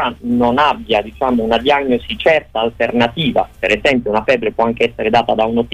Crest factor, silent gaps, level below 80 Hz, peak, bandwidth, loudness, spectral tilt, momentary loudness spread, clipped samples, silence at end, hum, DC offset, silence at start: 12 dB; none; -40 dBFS; -2 dBFS; 10 kHz; -15 LUFS; -6 dB/octave; 4 LU; under 0.1%; 0 s; none; under 0.1%; 0 s